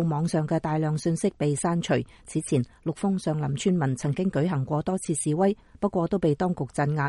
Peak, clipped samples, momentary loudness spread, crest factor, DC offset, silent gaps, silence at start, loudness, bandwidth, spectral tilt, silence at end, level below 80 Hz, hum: -10 dBFS; under 0.1%; 3 LU; 16 dB; under 0.1%; none; 0 s; -26 LUFS; 11.5 kHz; -6.5 dB/octave; 0 s; -54 dBFS; none